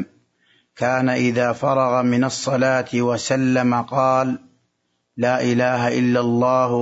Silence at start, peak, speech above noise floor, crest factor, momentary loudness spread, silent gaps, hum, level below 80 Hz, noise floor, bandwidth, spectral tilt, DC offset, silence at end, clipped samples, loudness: 0 s; -4 dBFS; 53 dB; 14 dB; 5 LU; none; none; -62 dBFS; -71 dBFS; 8 kHz; -6 dB/octave; under 0.1%; 0 s; under 0.1%; -19 LUFS